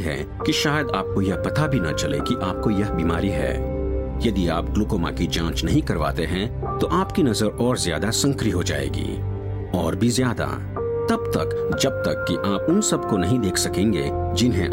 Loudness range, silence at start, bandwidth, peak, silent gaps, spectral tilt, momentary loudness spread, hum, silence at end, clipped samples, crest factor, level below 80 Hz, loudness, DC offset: 2 LU; 0 s; 16.5 kHz; -6 dBFS; none; -5 dB/octave; 6 LU; none; 0 s; under 0.1%; 16 dB; -34 dBFS; -22 LUFS; under 0.1%